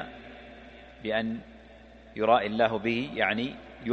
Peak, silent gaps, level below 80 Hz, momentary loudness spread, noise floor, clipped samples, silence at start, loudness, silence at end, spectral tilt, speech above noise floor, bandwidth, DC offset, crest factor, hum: -8 dBFS; none; -56 dBFS; 23 LU; -51 dBFS; under 0.1%; 0 s; -28 LUFS; 0 s; -6.5 dB/octave; 24 dB; 6.6 kHz; under 0.1%; 22 dB; none